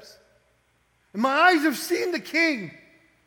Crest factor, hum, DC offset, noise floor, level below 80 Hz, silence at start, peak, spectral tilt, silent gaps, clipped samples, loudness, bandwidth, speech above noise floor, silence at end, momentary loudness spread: 20 dB; none; under 0.1%; -66 dBFS; -74 dBFS; 1.15 s; -6 dBFS; -3 dB/octave; none; under 0.1%; -22 LUFS; 19.5 kHz; 44 dB; 0.55 s; 15 LU